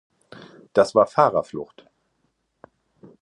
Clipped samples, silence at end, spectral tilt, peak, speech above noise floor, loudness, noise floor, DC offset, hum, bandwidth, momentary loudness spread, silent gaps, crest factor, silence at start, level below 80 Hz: under 0.1%; 1.6 s; -5.5 dB/octave; -2 dBFS; 52 dB; -20 LUFS; -71 dBFS; under 0.1%; none; 11 kHz; 18 LU; none; 22 dB; 0.75 s; -64 dBFS